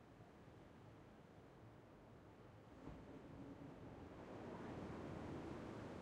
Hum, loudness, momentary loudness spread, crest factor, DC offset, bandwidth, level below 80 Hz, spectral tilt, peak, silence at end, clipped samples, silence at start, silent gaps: none; -57 LUFS; 12 LU; 18 dB; under 0.1%; 11.5 kHz; -72 dBFS; -7 dB/octave; -38 dBFS; 0 s; under 0.1%; 0 s; none